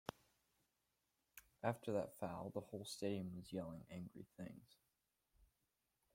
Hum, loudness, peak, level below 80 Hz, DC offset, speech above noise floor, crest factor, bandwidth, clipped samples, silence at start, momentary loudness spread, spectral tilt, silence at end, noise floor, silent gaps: none; -48 LUFS; -26 dBFS; -78 dBFS; under 0.1%; 40 dB; 26 dB; 16.5 kHz; under 0.1%; 0.1 s; 15 LU; -6 dB/octave; 0.7 s; -88 dBFS; none